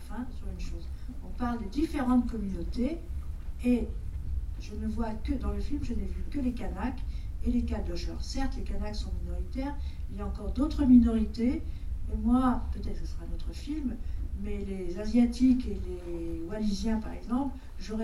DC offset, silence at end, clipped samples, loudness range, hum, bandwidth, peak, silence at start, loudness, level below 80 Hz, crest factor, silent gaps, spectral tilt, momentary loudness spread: under 0.1%; 0 s; under 0.1%; 7 LU; none; 11.5 kHz; -10 dBFS; 0 s; -32 LUFS; -36 dBFS; 20 dB; none; -7.5 dB/octave; 14 LU